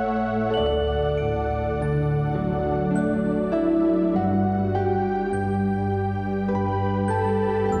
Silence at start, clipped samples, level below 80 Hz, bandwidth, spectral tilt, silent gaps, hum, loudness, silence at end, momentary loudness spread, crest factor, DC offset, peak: 0 s; under 0.1%; -38 dBFS; 9 kHz; -8.5 dB/octave; none; none; -23 LUFS; 0 s; 3 LU; 12 dB; under 0.1%; -12 dBFS